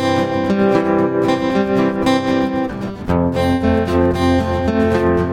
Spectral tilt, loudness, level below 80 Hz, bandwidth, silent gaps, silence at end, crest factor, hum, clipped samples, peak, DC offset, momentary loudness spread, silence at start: -7 dB/octave; -16 LUFS; -38 dBFS; 15 kHz; none; 0 s; 14 dB; none; under 0.1%; -2 dBFS; under 0.1%; 4 LU; 0 s